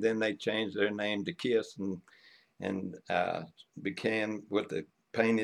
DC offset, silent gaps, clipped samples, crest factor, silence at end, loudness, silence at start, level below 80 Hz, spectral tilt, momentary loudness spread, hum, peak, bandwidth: under 0.1%; none; under 0.1%; 20 dB; 0 s; -34 LUFS; 0 s; -78 dBFS; -5.5 dB/octave; 9 LU; none; -14 dBFS; 11.5 kHz